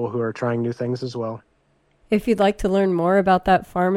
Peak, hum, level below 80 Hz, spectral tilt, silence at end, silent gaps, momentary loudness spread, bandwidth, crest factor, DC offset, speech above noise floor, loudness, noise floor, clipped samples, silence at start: -4 dBFS; none; -44 dBFS; -7 dB/octave; 0 s; none; 11 LU; 14 kHz; 16 dB; under 0.1%; 43 dB; -21 LUFS; -63 dBFS; under 0.1%; 0 s